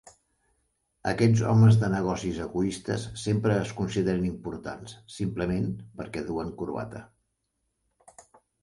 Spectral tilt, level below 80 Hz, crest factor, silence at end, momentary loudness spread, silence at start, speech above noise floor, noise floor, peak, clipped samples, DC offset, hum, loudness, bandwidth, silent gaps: -7 dB/octave; -52 dBFS; 18 dB; 1.55 s; 17 LU; 1.05 s; 52 dB; -78 dBFS; -8 dBFS; under 0.1%; under 0.1%; none; -27 LUFS; 11.5 kHz; none